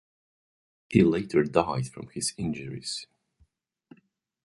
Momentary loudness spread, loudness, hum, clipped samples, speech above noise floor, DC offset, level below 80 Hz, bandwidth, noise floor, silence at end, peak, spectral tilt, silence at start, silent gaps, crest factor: 12 LU; -27 LUFS; none; under 0.1%; 41 dB; under 0.1%; -56 dBFS; 11.5 kHz; -68 dBFS; 1.4 s; -4 dBFS; -5.5 dB/octave; 0.9 s; none; 26 dB